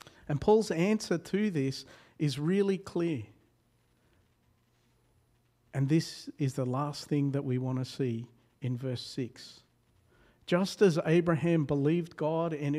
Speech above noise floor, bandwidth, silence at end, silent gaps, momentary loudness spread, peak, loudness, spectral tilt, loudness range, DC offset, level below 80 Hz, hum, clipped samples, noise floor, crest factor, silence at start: 40 dB; 14.5 kHz; 0 s; none; 14 LU; -12 dBFS; -31 LUFS; -7 dB/octave; 7 LU; under 0.1%; -64 dBFS; none; under 0.1%; -70 dBFS; 20 dB; 0.3 s